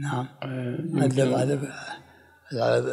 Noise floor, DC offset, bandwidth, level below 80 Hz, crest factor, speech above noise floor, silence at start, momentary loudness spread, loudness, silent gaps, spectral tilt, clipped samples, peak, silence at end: -53 dBFS; under 0.1%; 14.5 kHz; -70 dBFS; 16 dB; 28 dB; 0 s; 15 LU; -26 LUFS; none; -6.5 dB/octave; under 0.1%; -10 dBFS; 0 s